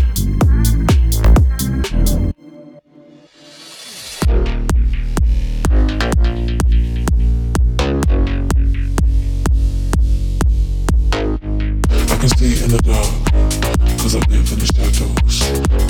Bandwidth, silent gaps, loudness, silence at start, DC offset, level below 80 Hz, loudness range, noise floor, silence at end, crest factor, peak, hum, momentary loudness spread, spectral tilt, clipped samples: 18.5 kHz; none; -16 LUFS; 0 s; under 0.1%; -14 dBFS; 5 LU; -44 dBFS; 0 s; 12 dB; -2 dBFS; none; 5 LU; -5.5 dB/octave; under 0.1%